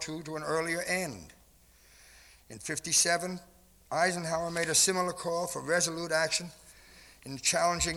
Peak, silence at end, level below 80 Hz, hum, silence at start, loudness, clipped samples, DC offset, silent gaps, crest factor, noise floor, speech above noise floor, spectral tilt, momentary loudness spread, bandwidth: -14 dBFS; 0 s; -58 dBFS; none; 0 s; -29 LUFS; under 0.1%; under 0.1%; none; 18 dB; -61 dBFS; 30 dB; -2 dB/octave; 18 LU; over 20 kHz